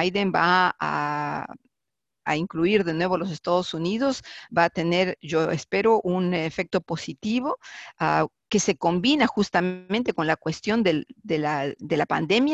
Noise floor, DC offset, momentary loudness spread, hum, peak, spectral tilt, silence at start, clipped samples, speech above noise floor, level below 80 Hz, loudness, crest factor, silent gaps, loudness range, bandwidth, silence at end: -87 dBFS; under 0.1%; 8 LU; none; -4 dBFS; -5 dB/octave; 0 s; under 0.1%; 63 dB; -60 dBFS; -24 LUFS; 20 dB; none; 2 LU; 8.4 kHz; 0 s